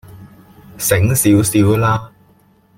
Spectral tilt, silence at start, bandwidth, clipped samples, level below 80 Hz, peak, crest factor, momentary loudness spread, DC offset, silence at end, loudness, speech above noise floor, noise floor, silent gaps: -5.5 dB/octave; 0.1 s; 16.5 kHz; under 0.1%; -44 dBFS; -2 dBFS; 14 dB; 7 LU; under 0.1%; 0.7 s; -14 LUFS; 39 dB; -52 dBFS; none